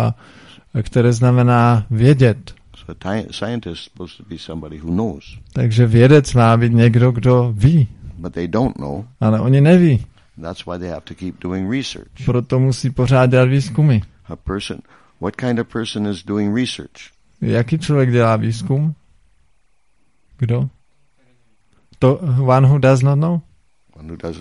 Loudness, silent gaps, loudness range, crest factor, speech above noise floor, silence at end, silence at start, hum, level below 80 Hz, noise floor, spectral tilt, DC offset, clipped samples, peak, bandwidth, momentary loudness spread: -16 LUFS; none; 9 LU; 16 dB; 48 dB; 0.05 s; 0 s; none; -40 dBFS; -64 dBFS; -7.5 dB/octave; 0.2%; under 0.1%; 0 dBFS; 11 kHz; 18 LU